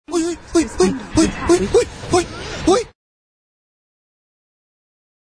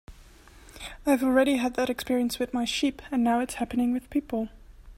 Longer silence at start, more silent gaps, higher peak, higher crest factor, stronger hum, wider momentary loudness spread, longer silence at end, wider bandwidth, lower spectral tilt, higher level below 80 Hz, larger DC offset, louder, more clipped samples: about the same, 0.1 s vs 0.1 s; neither; first, -2 dBFS vs -10 dBFS; about the same, 18 dB vs 18 dB; neither; second, 6 LU vs 10 LU; first, 2.5 s vs 0.05 s; second, 10.5 kHz vs 16 kHz; about the same, -4.5 dB/octave vs -4 dB/octave; first, -38 dBFS vs -50 dBFS; neither; first, -18 LUFS vs -27 LUFS; neither